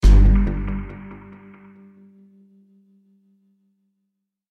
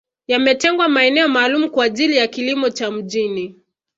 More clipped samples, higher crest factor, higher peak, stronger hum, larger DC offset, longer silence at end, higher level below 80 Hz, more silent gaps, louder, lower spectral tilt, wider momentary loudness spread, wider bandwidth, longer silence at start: neither; about the same, 18 dB vs 16 dB; about the same, -2 dBFS vs -2 dBFS; neither; neither; first, 3.35 s vs 0.45 s; first, -22 dBFS vs -64 dBFS; neither; second, -20 LUFS vs -16 LUFS; first, -8 dB/octave vs -3 dB/octave; first, 29 LU vs 9 LU; second, 6.6 kHz vs 8 kHz; second, 0.05 s vs 0.3 s